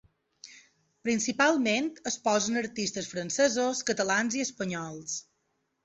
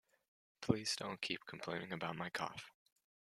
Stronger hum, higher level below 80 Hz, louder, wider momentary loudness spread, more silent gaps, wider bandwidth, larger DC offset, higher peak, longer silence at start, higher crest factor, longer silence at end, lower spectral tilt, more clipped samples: neither; first, -70 dBFS vs -76 dBFS; first, -29 LUFS vs -42 LUFS; about the same, 11 LU vs 10 LU; neither; second, 8.4 kHz vs 14.5 kHz; neither; first, -10 dBFS vs -16 dBFS; second, 0.45 s vs 0.6 s; second, 20 dB vs 30 dB; about the same, 0.6 s vs 0.7 s; about the same, -3 dB/octave vs -4 dB/octave; neither